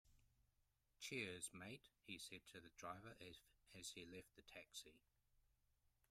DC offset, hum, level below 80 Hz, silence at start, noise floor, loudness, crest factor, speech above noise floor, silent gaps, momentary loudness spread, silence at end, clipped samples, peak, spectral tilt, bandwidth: under 0.1%; none; -82 dBFS; 0.05 s; -85 dBFS; -56 LUFS; 24 dB; 27 dB; none; 13 LU; 0.25 s; under 0.1%; -36 dBFS; -2.5 dB/octave; 15.5 kHz